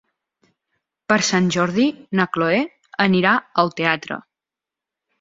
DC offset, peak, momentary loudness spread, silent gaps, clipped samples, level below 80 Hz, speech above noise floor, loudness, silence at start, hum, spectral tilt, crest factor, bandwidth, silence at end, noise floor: under 0.1%; -2 dBFS; 10 LU; none; under 0.1%; -60 dBFS; 69 dB; -19 LUFS; 1.1 s; none; -4.5 dB/octave; 20 dB; 7.8 kHz; 1 s; -87 dBFS